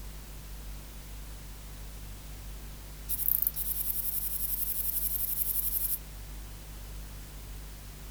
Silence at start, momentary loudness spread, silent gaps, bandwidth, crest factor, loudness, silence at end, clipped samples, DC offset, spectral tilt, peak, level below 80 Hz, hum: 0 s; 18 LU; none; over 20 kHz; 28 dB; -29 LUFS; 0 s; under 0.1%; under 0.1%; -2.5 dB/octave; -8 dBFS; -44 dBFS; 50 Hz at -45 dBFS